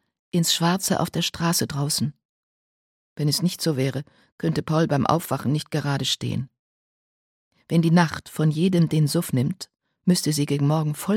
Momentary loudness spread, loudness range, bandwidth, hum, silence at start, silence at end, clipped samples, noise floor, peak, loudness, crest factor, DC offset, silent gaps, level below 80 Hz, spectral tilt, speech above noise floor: 8 LU; 3 LU; 17 kHz; none; 0.35 s; 0 s; under 0.1%; under -90 dBFS; -4 dBFS; -23 LUFS; 20 dB; under 0.1%; 2.25-3.16 s, 4.32-4.38 s, 6.59-7.51 s; -58 dBFS; -5 dB/octave; over 68 dB